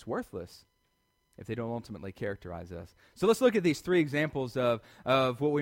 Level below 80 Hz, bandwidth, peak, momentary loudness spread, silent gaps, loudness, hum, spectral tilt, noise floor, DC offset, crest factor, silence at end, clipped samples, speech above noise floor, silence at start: -62 dBFS; 16.5 kHz; -12 dBFS; 18 LU; none; -30 LUFS; none; -6 dB/octave; -75 dBFS; under 0.1%; 20 dB; 0 s; under 0.1%; 44 dB; 0 s